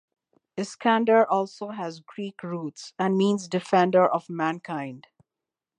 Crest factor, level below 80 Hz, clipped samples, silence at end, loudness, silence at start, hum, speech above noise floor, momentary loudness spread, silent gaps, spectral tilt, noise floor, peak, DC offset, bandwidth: 20 dB; -78 dBFS; under 0.1%; 0.8 s; -25 LUFS; 0.55 s; none; 64 dB; 16 LU; none; -6 dB/octave; -88 dBFS; -6 dBFS; under 0.1%; 10 kHz